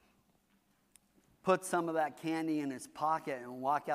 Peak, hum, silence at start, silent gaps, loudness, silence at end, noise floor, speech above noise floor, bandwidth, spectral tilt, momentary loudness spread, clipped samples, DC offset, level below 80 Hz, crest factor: -14 dBFS; none; 1.45 s; none; -35 LUFS; 0 s; -73 dBFS; 39 dB; 15.5 kHz; -5 dB/octave; 7 LU; under 0.1%; under 0.1%; -82 dBFS; 22 dB